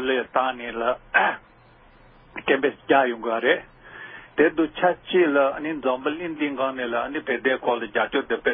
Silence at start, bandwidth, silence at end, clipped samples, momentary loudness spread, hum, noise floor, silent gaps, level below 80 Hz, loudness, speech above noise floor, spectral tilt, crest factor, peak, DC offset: 0 s; 3.8 kHz; 0 s; under 0.1%; 9 LU; none; -53 dBFS; none; -58 dBFS; -23 LUFS; 30 dB; -9 dB/octave; 20 dB; -4 dBFS; under 0.1%